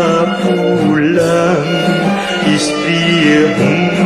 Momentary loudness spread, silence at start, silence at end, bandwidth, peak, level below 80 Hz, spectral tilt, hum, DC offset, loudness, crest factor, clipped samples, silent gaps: 4 LU; 0 s; 0 s; 13 kHz; 0 dBFS; -46 dBFS; -5.5 dB/octave; none; under 0.1%; -12 LUFS; 12 dB; under 0.1%; none